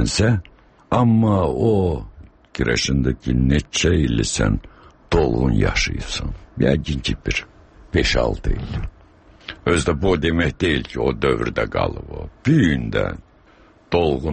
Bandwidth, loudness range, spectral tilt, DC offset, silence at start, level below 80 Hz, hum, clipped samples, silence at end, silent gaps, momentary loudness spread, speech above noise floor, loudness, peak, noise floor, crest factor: 8.8 kHz; 3 LU; -5.5 dB/octave; under 0.1%; 0 s; -30 dBFS; none; under 0.1%; 0 s; none; 10 LU; 32 dB; -20 LUFS; -4 dBFS; -51 dBFS; 16 dB